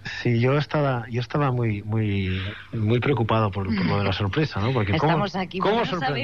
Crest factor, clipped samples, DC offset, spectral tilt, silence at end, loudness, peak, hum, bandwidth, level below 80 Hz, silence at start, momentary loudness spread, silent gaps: 14 dB; under 0.1%; 0.3%; -7.5 dB/octave; 0 s; -24 LUFS; -8 dBFS; none; 7 kHz; -50 dBFS; 0 s; 6 LU; none